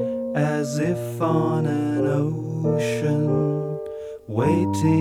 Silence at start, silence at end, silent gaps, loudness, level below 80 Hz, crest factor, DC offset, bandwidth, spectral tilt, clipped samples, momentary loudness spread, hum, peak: 0 s; 0 s; none; -23 LUFS; -56 dBFS; 14 dB; under 0.1%; 14.5 kHz; -7.5 dB/octave; under 0.1%; 7 LU; none; -8 dBFS